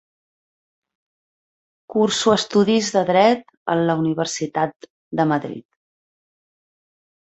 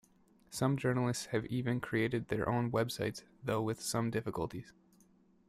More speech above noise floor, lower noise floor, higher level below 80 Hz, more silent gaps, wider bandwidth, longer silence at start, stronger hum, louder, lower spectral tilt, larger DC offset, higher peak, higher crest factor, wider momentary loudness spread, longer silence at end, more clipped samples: first, over 71 dB vs 32 dB; first, under -90 dBFS vs -67 dBFS; about the same, -64 dBFS vs -64 dBFS; first, 3.57-3.66 s, 4.76-4.80 s, 4.90-5.11 s vs none; second, 8.2 kHz vs 15 kHz; first, 1.9 s vs 0.5 s; neither; first, -19 LUFS vs -35 LUFS; about the same, -4.5 dB/octave vs -5.5 dB/octave; neither; first, -2 dBFS vs -18 dBFS; about the same, 20 dB vs 18 dB; first, 10 LU vs 7 LU; first, 1.75 s vs 0.8 s; neither